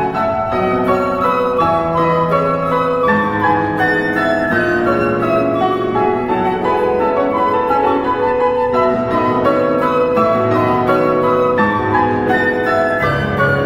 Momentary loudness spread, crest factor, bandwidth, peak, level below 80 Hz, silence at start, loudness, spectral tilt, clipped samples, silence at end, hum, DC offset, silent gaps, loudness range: 2 LU; 14 dB; 15.5 kHz; -2 dBFS; -40 dBFS; 0 s; -15 LUFS; -7.5 dB/octave; under 0.1%; 0 s; none; under 0.1%; none; 1 LU